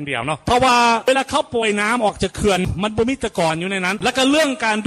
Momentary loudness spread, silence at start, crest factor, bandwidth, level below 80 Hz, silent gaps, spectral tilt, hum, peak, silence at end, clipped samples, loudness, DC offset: 6 LU; 0 s; 14 dB; 15.5 kHz; -40 dBFS; none; -4 dB/octave; none; -4 dBFS; 0 s; under 0.1%; -18 LUFS; under 0.1%